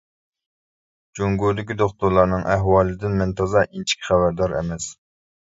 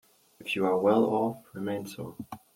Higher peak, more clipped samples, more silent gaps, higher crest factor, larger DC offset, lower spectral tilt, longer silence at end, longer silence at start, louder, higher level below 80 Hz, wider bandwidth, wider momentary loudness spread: first, -2 dBFS vs -12 dBFS; neither; neither; about the same, 20 dB vs 18 dB; neither; about the same, -5.5 dB/octave vs -6.5 dB/octave; first, 0.5 s vs 0.2 s; first, 1.15 s vs 0.4 s; first, -21 LUFS vs -28 LUFS; first, -40 dBFS vs -72 dBFS; second, 8 kHz vs 16.5 kHz; second, 9 LU vs 17 LU